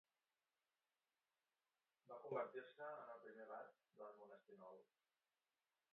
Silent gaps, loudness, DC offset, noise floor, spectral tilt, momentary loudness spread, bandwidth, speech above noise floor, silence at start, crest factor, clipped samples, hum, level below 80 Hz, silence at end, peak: none; -56 LUFS; under 0.1%; under -90 dBFS; -4 dB/octave; 15 LU; 4 kHz; over 35 dB; 2.05 s; 24 dB; under 0.1%; none; under -90 dBFS; 1.1 s; -34 dBFS